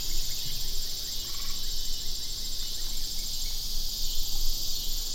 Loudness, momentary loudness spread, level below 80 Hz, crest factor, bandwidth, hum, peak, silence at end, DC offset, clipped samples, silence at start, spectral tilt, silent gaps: -32 LUFS; 2 LU; -32 dBFS; 14 dB; 16.5 kHz; none; -12 dBFS; 0 s; under 0.1%; under 0.1%; 0 s; -0.5 dB/octave; none